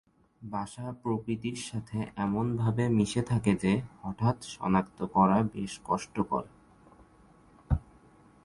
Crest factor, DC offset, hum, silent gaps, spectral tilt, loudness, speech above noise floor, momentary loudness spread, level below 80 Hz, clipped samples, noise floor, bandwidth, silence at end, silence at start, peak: 20 dB; under 0.1%; none; none; -7 dB/octave; -31 LUFS; 29 dB; 11 LU; -48 dBFS; under 0.1%; -59 dBFS; 11.5 kHz; 0.65 s; 0.4 s; -10 dBFS